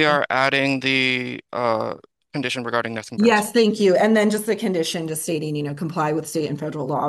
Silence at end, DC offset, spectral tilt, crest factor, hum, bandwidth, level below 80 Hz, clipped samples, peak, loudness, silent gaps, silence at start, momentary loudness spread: 0 s; under 0.1%; -4.5 dB/octave; 18 dB; none; 12.5 kHz; -68 dBFS; under 0.1%; -4 dBFS; -21 LUFS; none; 0 s; 10 LU